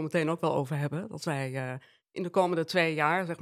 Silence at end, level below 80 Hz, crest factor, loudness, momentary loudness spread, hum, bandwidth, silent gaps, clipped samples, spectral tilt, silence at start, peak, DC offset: 0 s; -78 dBFS; 18 dB; -30 LUFS; 12 LU; none; 14.5 kHz; none; under 0.1%; -6 dB/octave; 0 s; -10 dBFS; under 0.1%